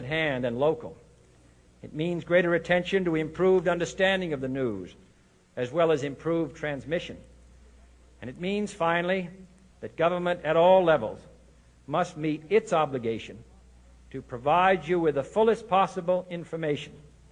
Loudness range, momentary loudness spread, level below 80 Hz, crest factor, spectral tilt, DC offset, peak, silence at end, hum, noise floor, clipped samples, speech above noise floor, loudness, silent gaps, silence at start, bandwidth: 5 LU; 19 LU; -56 dBFS; 18 dB; -6 dB/octave; under 0.1%; -8 dBFS; 0.3 s; none; -60 dBFS; under 0.1%; 34 dB; -26 LUFS; none; 0 s; 10 kHz